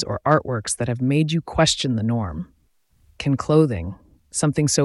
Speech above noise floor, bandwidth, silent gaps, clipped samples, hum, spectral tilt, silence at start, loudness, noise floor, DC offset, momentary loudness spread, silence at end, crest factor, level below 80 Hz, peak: 41 dB; 12 kHz; none; under 0.1%; none; -5 dB/octave; 0 s; -21 LUFS; -62 dBFS; under 0.1%; 12 LU; 0 s; 18 dB; -44 dBFS; -2 dBFS